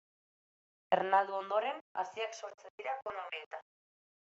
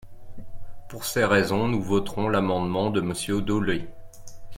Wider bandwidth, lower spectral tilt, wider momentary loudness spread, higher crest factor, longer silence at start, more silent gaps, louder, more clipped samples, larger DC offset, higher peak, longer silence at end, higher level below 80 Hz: second, 8 kHz vs 16.5 kHz; second, -1 dB/octave vs -5.5 dB/octave; first, 17 LU vs 10 LU; about the same, 24 dB vs 20 dB; first, 0.9 s vs 0 s; first, 1.81-1.95 s, 2.54-2.58 s, 2.70-2.78 s, 3.46-3.51 s vs none; second, -36 LUFS vs -25 LUFS; neither; neither; second, -14 dBFS vs -6 dBFS; first, 0.75 s vs 0 s; second, -86 dBFS vs -46 dBFS